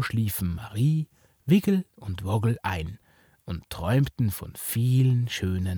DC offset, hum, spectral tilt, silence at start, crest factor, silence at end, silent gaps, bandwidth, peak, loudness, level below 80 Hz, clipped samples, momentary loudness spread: under 0.1%; none; -6.5 dB/octave; 0 s; 16 dB; 0 s; none; over 20 kHz; -10 dBFS; -26 LUFS; -48 dBFS; under 0.1%; 14 LU